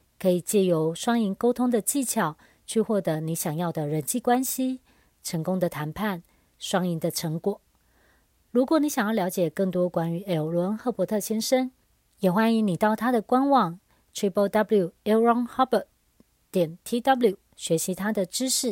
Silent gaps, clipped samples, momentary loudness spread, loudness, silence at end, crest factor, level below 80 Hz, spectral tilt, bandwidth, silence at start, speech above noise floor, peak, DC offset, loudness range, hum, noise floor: none; under 0.1%; 8 LU; -25 LUFS; 0 s; 18 dB; -64 dBFS; -5 dB/octave; 16.5 kHz; 0.2 s; 39 dB; -8 dBFS; under 0.1%; 4 LU; none; -64 dBFS